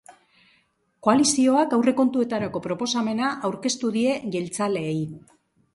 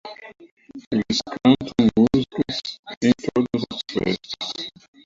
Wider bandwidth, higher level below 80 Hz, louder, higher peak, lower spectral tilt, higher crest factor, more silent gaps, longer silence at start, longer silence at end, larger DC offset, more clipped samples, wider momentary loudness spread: first, 11.5 kHz vs 7.6 kHz; second, -66 dBFS vs -50 dBFS; about the same, -23 LUFS vs -22 LUFS; about the same, -6 dBFS vs -4 dBFS; second, -4 dB/octave vs -5.5 dB/octave; about the same, 18 dB vs 18 dB; second, none vs 0.51-0.57 s, 0.87-0.91 s, 2.79-2.83 s, 2.97-3.01 s; about the same, 0.1 s vs 0.05 s; first, 0.55 s vs 0.35 s; neither; neither; second, 9 LU vs 15 LU